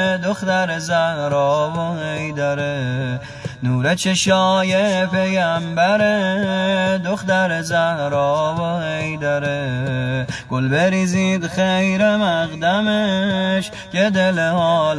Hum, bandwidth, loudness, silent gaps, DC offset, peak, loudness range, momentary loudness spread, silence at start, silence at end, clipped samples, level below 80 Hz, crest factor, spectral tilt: none; 11 kHz; -18 LUFS; none; under 0.1%; -2 dBFS; 3 LU; 7 LU; 0 s; 0 s; under 0.1%; -50 dBFS; 16 dB; -5 dB/octave